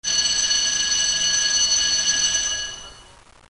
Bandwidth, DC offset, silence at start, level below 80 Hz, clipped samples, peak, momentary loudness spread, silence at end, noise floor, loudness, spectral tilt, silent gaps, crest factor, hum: 11.5 kHz; 0.2%; 0.05 s; -48 dBFS; under 0.1%; -8 dBFS; 8 LU; 0.5 s; -48 dBFS; -18 LUFS; 2.5 dB/octave; none; 14 dB; none